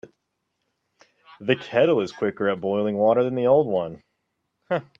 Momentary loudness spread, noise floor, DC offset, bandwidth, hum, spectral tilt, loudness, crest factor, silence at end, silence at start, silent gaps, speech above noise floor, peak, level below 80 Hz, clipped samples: 9 LU; -77 dBFS; under 0.1%; 7.6 kHz; none; -7 dB/octave; -22 LUFS; 20 dB; 0.15 s; 1.4 s; none; 55 dB; -4 dBFS; -68 dBFS; under 0.1%